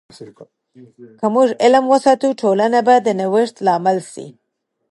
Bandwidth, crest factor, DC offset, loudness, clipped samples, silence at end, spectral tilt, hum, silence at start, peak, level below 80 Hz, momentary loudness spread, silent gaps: 11.5 kHz; 16 dB; under 0.1%; -15 LUFS; under 0.1%; 0.65 s; -5.5 dB/octave; none; 0.2 s; 0 dBFS; -70 dBFS; 10 LU; none